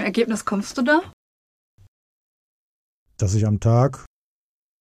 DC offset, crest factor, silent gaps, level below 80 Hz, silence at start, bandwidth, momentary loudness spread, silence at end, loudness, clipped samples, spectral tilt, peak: under 0.1%; 18 dB; 1.13-1.78 s, 1.88-3.06 s; -50 dBFS; 0 s; 13 kHz; 8 LU; 0.75 s; -21 LUFS; under 0.1%; -6.5 dB/octave; -6 dBFS